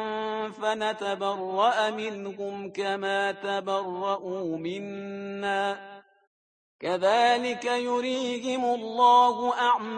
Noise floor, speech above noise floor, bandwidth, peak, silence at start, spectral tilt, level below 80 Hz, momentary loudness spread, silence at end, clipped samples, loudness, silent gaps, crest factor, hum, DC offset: under -90 dBFS; over 64 dB; 9.8 kHz; -8 dBFS; 0 s; -4 dB/octave; -76 dBFS; 13 LU; 0 s; under 0.1%; -27 LUFS; 6.27-6.79 s; 18 dB; none; under 0.1%